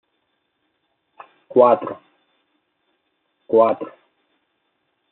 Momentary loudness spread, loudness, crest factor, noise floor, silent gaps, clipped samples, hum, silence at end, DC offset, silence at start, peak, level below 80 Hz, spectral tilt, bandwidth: 20 LU; -18 LUFS; 22 dB; -71 dBFS; none; under 0.1%; none; 1.25 s; under 0.1%; 1.55 s; -2 dBFS; -78 dBFS; -6 dB/octave; 4.1 kHz